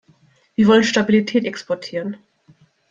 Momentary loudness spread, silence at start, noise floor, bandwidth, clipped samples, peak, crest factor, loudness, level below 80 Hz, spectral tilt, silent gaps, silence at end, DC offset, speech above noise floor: 15 LU; 0.6 s; -56 dBFS; 7.6 kHz; under 0.1%; -2 dBFS; 18 dB; -18 LUFS; -60 dBFS; -5 dB/octave; none; 0.75 s; under 0.1%; 39 dB